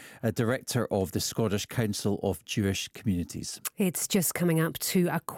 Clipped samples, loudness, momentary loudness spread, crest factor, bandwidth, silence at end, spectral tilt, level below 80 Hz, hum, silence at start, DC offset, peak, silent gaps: under 0.1%; -29 LUFS; 5 LU; 14 dB; 17.5 kHz; 0 s; -4.5 dB/octave; -60 dBFS; none; 0 s; under 0.1%; -14 dBFS; none